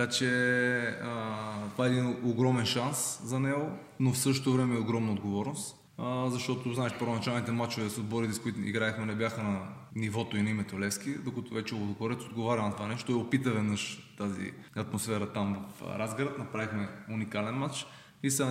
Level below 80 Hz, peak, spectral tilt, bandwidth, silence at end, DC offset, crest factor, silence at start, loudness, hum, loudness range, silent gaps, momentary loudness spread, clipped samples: -70 dBFS; -14 dBFS; -5 dB/octave; 16 kHz; 0 s; under 0.1%; 18 dB; 0 s; -32 LUFS; none; 5 LU; none; 9 LU; under 0.1%